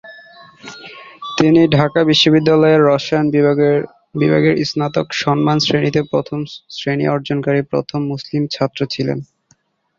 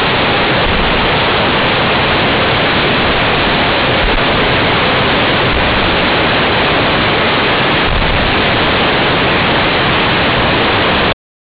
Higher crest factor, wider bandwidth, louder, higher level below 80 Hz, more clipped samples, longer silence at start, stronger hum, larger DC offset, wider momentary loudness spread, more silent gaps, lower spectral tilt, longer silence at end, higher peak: first, 14 dB vs 4 dB; first, 7.6 kHz vs 4 kHz; second, -15 LUFS vs -10 LUFS; second, -52 dBFS vs -26 dBFS; neither; about the same, 0.05 s vs 0 s; neither; neither; first, 15 LU vs 1 LU; neither; second, -6 dB/octave vs -8.5 dB/octave; first, 0.75 s vs 0.35 s; first, -2 dBFS vs -6 dBFS